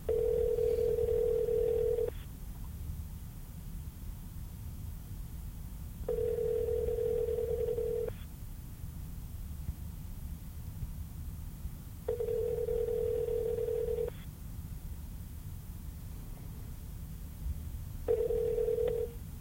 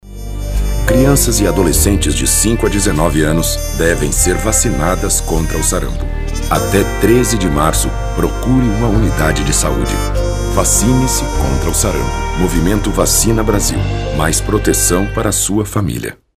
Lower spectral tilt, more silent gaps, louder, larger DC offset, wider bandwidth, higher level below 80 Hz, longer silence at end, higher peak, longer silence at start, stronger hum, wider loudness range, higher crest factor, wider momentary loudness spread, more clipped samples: first, -7 dB/octave vs -4.5 dB/octave; neither; second, -36 LUFS vs -14 LUFS; neither; about the same, 16.5 kHz vs 16 kHz; second, -44 dBFS vs -18 dBFS; second, 0 s vs 0.25 s; second, -18 dBFS vs 0 dBFS; about the same, 0 s vs 0.05 s; neither; first, 10 LU vs 2 LU; about the same, 16 dB vs 14 dB; first, 15 LU vs 7 LU; neither